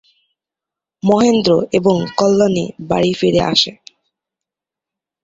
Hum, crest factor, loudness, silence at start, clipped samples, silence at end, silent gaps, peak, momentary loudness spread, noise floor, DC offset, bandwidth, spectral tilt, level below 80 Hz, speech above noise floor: none; 16 dB; -15 LUFS; 1.05 s; under 0.1%; 1.5 s; none; 0 dBFS; 7 LU; -86 dBFS; under 0.1%; 8 kHz; -5.5 dB/octave; -48 dBFS; 72 dB